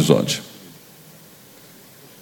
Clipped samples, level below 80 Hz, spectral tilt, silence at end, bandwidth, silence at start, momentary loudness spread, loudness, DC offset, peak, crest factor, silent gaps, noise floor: under 0.1%; -60 dBFS; -5 dB/octave; 1.65 s; 18 kHz; 0 s; 26 LU; -20 LUFS; under 0.1%; 0 dBFS; 24 dB; none; -46 dBFS